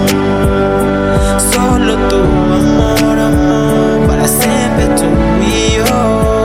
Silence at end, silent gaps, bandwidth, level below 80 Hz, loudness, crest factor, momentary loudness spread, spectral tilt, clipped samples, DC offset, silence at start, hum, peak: 0 s; none; 16.5 kHz; -20 dBFS; -11 LUFS; 10 dB; 2 LU; -5 dB/octave; under 0.1%; under 0.1%; 0 s; none; 0 dBFS